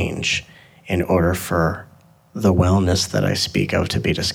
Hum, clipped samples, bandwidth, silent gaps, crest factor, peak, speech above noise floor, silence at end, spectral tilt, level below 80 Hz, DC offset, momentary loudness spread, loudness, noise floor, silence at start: none; under 0.1%; 17.5 kHz; none; 18 dB; -2 dBFS; 27 dB; 0 s; -5 dB/octave; -38 dBFS; under 0.1%; 7 LU; -19 LUFS; -46 dBFS; 0 s